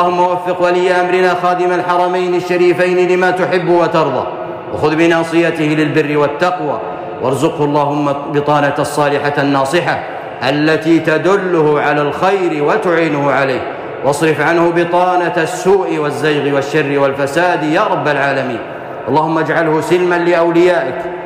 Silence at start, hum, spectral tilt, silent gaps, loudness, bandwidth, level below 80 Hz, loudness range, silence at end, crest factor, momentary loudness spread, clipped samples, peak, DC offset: 0 s; none; -6 dB/octave; none; -13 LUFS; 15.5 kHz; -52 dBFS; 2 LU; 0 s; 10 dB; 6 LU; under 0.1%; -2 dBFS; under 0.1%